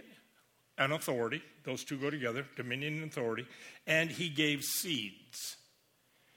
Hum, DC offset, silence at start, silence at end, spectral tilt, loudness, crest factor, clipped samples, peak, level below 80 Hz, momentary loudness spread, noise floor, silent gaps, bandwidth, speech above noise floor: none; under 0.1%; 0.05 s; 0.8 s; -3.5 dB/octave; -35 LUFS; 22 dB; under 0.1%; -16 dBFS; -80 dBFS; 12 LU; -71 dBFS; none; 18 kHz; 35 dB